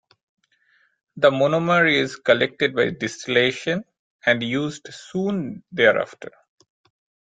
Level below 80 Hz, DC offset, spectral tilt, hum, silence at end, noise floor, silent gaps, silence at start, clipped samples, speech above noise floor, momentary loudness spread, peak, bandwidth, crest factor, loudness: -62 dBFS; under 0.1%; -5 dB/octave; none; 1 s; -63 dBFS; 3.99-4.19 s; 1.15 s; under 0.1%; 42 dB; 13 LU; -2 dBFS; 9.2 kHz; 20 dB; -21 LUFS